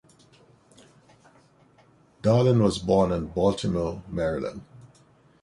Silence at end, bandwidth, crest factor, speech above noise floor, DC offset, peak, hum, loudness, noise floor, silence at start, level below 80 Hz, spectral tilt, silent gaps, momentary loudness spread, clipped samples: 0.6 s; 11.5 kHz; 18 dB; 35 dB; under 0.1%; -8 dBFS; none; -24 LUFS; -59 dBFS; 2.25 s; -48 dBFS; -7 dB/octave; none; 11 LU; under 0.1%